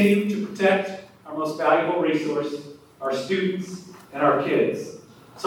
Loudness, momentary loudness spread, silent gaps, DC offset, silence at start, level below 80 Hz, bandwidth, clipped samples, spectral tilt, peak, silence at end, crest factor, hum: -23 LUFS; 16 LU; none; under 0.1%; 0 s; -70 dBFS; 17.5 kHz; under 0.1%; -6 dB/octave; -6 dBFS; 0 s; 18 dB; none